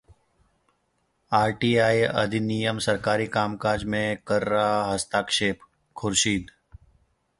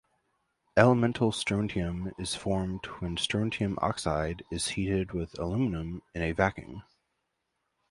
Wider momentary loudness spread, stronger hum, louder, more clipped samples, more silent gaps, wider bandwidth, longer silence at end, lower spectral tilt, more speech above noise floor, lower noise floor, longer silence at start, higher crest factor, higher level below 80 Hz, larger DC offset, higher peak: second, 5 LU vs 11 LU; neither; first, -24 LUFS vs -30 LUFS; neither; neither; about the same, 11.5 kHz vs 11.5 kHz; second, 0.9 s vs 1.1 s; second, -4 dB/octave vs -5.5 dB/octave; about the same, 48 dB vs 51 dB; second, -71 dBFS vs -81 dBFS; first, 1.3 s vs 0.75 s; second, 20 dB vs 26 dB; about the same, -52 dBFS vs -48 dBFS; neither; about the same, -6 dBFS vs -4 dBFS